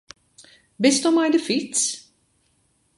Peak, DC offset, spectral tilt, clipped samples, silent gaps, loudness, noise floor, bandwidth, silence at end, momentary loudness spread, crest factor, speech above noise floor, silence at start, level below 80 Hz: -4 dBFS; under 0.1%; -2.5 dB/octave; under 0.1%; none; -20 LUFS; -66 dBFS; 11.5 kHz; 1 s; 6 LU; 20 dB; 46 dB; 0.8 s; -70 dBFS